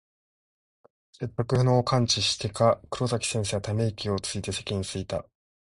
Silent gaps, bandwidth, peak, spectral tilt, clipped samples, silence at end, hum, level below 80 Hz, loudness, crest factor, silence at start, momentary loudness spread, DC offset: none; 11.5 kHz; -8 dBFS; -4.5 dB/octave; under 0.1%; 0.45 s; none; -50 dBFS; -27 LUFS; 20 dB; 1.2 s; 10 LU; under 0.1%